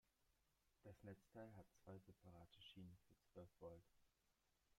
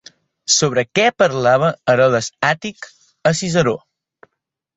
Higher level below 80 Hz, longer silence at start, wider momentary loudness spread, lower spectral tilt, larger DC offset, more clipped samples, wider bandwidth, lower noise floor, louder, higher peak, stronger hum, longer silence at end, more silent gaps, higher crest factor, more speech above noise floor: second, -84 dBFS vs -56 dBFS; second, 0.05 s vs 0.5 s; second, 6 LU vs 15 LU; first, -6.5 dB/octave vs -3.5 dB/octave; neither; neither; first, 13.5 kHz vs 8.4 kHz; first, -87 dBFS vs -77 dBFS; second, -65 LUFS vs -16 LUFS; second, -48 dBFS vs -2 dBFS; neither; second, 0.05 s vs 1 s; neither; about the same, 18 dB vs 16 dB; second, 23 dB vs 61 dB